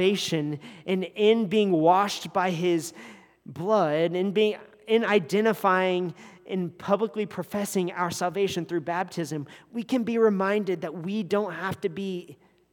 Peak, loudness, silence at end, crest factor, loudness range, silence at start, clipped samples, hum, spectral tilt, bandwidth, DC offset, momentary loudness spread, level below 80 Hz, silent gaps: -8 dBFS; -26 LUFS; 0.4 s; 18 dB; 4 LU; 0 s; under 0.1%; none; -5.5 dB/octave; 19 kHz; under 0.1%; 12 LU; -74 dBFS; none